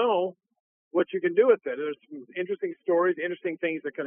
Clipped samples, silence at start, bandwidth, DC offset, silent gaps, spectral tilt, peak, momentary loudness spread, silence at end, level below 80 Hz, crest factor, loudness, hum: under 0.1%; 0 s; 3.6 kHz; under 0.1%; 0.60-0.91 s; -3.5 dB/octave; -8 dBFS; 12 LU; 0 s; under -90 dBFS; 18 dB; -27 LUFS; none